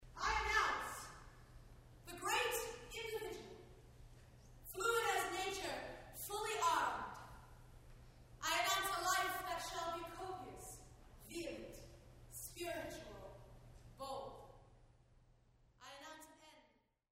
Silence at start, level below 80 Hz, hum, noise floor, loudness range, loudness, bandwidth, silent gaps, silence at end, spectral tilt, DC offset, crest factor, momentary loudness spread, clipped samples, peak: 0 s; -62 dBFS; none; -75 dBFS; 12 LU; -41 LUFS; 16 kHz; none; 0.55 s; -2 dB/octave; under 0.1%; 22 dB; 26 LU; under 0.1%; -22 dBFS